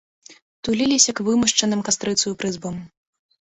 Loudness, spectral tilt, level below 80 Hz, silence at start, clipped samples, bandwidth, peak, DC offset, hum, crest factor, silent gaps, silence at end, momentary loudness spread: -19 LUFS; -2.5 dB/octave; -56 dBFS; 0.3 s; under 0.1%; 8.4 kHz; -2 dBFS; under 0.1%; none; 20 dB; 0.42-0.63 s; 0.55 s; 15 LU